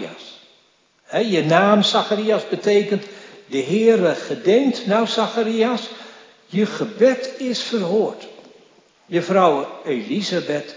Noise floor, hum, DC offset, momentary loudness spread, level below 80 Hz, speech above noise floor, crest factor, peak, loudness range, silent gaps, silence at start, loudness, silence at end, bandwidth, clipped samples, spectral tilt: -59 dBFS; none; under 0.1%; 11 LU; -80 dBFS; 40 dB; 20 dB; 0 dBFS; 4 LU; none; 0 s; -19 LUFS; 0 s; 7.6 kHz; under 0.1%; -5 dB/octave